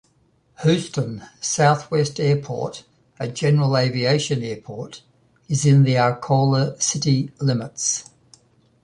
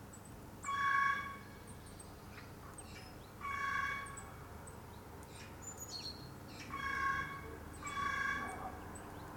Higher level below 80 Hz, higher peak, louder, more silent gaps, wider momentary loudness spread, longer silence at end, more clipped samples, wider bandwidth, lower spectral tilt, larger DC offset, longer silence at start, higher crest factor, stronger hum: about the same, -58 dBFS vs -60 dBFS; first, -4 dBFS vs -22 dBFS; first, -20 LUFS vs -41 LUFS; neither; second, 13 LU vs 16 LU; first, 0.8 s vs 0 s; neither; second, 10.5 kHz vs 19 kHz; first, -5 dB/octave vs -3 dB/octave; neither; first, 0.6 s vs 0 s; about the same, 18 dB vs 20 dB; neither